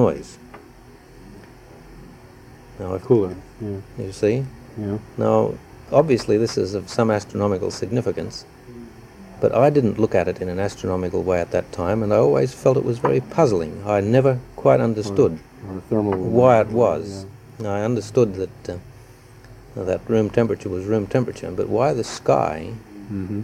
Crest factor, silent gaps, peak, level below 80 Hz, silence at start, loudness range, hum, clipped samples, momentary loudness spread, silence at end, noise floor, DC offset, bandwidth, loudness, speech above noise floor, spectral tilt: 20 dB; none; -2 dBFS; -48 dBFS; 0 s; 6 LU; none; under 0.1%; 16 LU; 0 s; -45 dBFS; under 0.1%; 15 kHz; -21 LUFS; 25 dB; -7 dB/octave